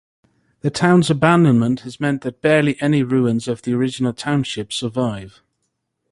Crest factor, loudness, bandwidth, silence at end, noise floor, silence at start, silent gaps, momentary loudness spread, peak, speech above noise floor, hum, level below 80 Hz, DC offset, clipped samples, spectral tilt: 18 dB; -18 LUFS; 11.5 kHz; 0.85 s; -73 dBFS; 0.65 s; none; 10 LU; -2 dBFS; 56 dB; none; -54 dBFS; under 0.1%; under 0.1%; -6.5 dB/octave